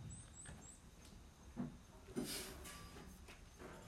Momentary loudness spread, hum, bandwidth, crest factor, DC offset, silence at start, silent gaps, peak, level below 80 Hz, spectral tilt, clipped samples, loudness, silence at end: 15 LU; none; 16 kHz; 20 dB; under 0.1%; 0 s; none; -32 dBFS; -62 dBFS; -4 dB/octave; under 0.1%; -53 LUFS; 0 s